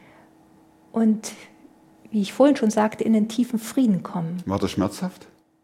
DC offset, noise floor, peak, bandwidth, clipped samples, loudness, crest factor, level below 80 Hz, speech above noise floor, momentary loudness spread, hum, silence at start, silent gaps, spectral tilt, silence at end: under 0.1%; -54 dBFS; -4 dBFS; 15.5 kHz; under 0.1%; -23 LUFS; 20 dB; -60 dBFS; 32 dB; 12 LU; none; 0.95 s; none; -6 dB/octave; 0.5 s